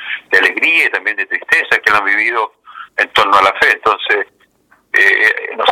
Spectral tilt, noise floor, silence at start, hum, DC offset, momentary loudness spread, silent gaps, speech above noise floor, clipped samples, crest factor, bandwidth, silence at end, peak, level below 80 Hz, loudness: -2 dB/octave; -53 dBFS; 0 s; none; under 0.1%; 8 LU; none; 40 dB; under 0.1%; 14 dB; 17 kHz; 0 s; 0 dBFS; -54 dBFS; -12 LUFS